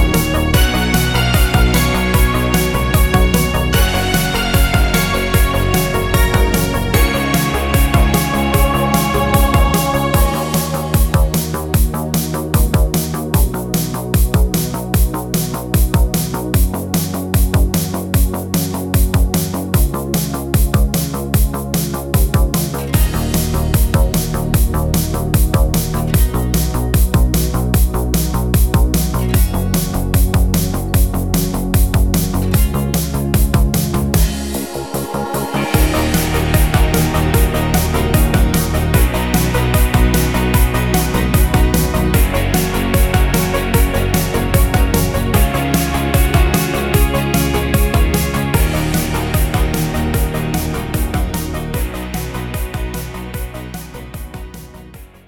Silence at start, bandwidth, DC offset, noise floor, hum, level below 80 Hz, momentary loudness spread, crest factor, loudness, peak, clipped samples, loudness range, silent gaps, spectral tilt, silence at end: 0 s; 19.5 kHz; 0.4%; -36 dBFS; none; -18 dBFS; 5 LU; 14 dB; -16 LUFS; 0 dBFS; under 0.1%; 3 LU; none; -5 dB/octave; 0.2 s